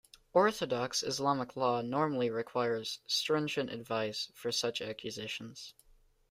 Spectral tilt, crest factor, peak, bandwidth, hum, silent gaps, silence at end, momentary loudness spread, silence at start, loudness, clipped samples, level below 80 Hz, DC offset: -3.5 dB/octave; 20 dB; -14 dBFS; 16 kHz; none; none; 0.6 s; 10 LU; 0.35 s; -34 LUFS; under 0.1%; -72 dBFS; under 0.1%